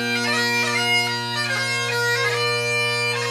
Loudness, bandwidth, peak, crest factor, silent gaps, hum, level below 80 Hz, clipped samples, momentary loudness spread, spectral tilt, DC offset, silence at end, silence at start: -20 LUFS; 15.5 kHz; -10 dBFS; 12 dB; none; none; -68 dBFS; under 0.1%; 3 LU; -2.5 dB/octave; under 0.1%; 0 s; 0 s